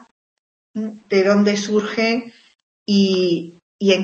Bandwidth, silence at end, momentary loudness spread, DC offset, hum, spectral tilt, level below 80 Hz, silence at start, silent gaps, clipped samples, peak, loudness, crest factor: 7.6 kHz; 0 s; 14 LU; under 0.1%; none; -5.5 dB/octave; -66 dBFS; 0.75 s; 2.63-2.86 s, 3.62-3.79 s; under 0.1%; -4 dBFS; -19 LUFS; 16 dB